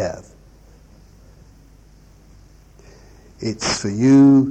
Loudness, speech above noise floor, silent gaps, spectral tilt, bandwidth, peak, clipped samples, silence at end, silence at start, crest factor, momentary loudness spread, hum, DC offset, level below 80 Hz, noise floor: -16 LUFS; 34 dB; none; -5.5 dB/octave; 8.8 kHz; -4 dBFS; under 0.1%; 0 s; 0 s; 16 dB; 18 LU; none; under 0.1%; -48 dBFS; -48 dBFS